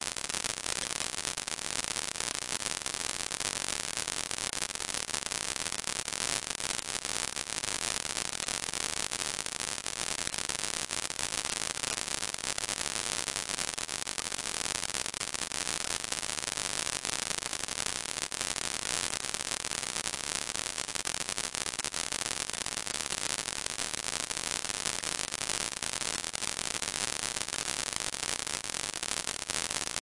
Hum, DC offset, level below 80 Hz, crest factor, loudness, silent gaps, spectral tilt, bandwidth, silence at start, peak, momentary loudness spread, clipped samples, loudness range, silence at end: none; 0.1%; -60 dBFS; 28 dB; -32 LUFS; none; 0 dB/octave; 11.5 kHz; 0 s; -6 dBFS; 2 LU; under 0.1%; 0 LU; 0 s